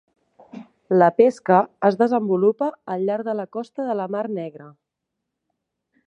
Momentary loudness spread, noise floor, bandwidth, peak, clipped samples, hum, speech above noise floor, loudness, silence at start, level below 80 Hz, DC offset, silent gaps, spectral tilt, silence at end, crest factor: 13 LU; -81 dBFS; 9.6 kHz; -2 dBFS; under 0.1%; none; 61 dB; -21 LUFS; 0.55 s; -76 dBFS; under 0.1%; none; -8 dB/octave; 1.35 s; 20 dB